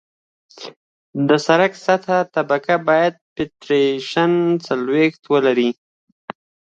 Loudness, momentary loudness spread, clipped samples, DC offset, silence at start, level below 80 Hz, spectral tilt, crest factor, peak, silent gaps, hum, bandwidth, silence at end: -18 LUFS; 21 LU; under 0.1%; under 0.1%; 0.6 s; -64 dBFS; -6 dB/octave; 18 dB; -2 dBFS; 0.76-1.13 s, 3.21-3.36 s, 5.19-5.23 s; none; 8.2 kHz; 1.05 s